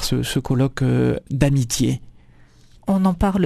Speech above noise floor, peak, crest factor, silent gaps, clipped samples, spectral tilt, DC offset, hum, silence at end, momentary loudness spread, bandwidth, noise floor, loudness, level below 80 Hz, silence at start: 30 dB; -2 dBFS; 18 dB; none; under 0.1%; -6 dB/octave; under 0.1%; none; 0 s; 4 LU; 14 kHz; -49 dBFS; -20 LUFS; -36 dBFS; 0 s